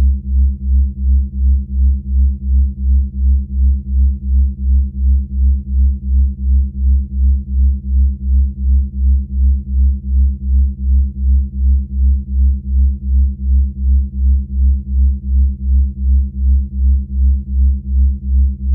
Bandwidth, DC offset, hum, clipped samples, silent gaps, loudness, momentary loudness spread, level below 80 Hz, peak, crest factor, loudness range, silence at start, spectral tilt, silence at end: 0.5 kHz; under 0.1%; none; under 0.1%; none; -16 LUFS; 1 LU; -12 dBFS; -4 dBFS; 8 dB; 0 LU; 0 s; -16.5 dB/octave; 0 s